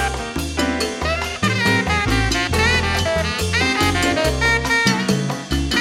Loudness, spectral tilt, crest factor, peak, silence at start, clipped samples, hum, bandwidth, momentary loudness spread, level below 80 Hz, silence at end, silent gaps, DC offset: -18 LUFS; -4 dB/octave; 16 dB; -4 dBFS; 0 s; under 0.1%; none; 16.5 kHz; 6 LU; -30 dBFS; 0 s; none; under 0.1%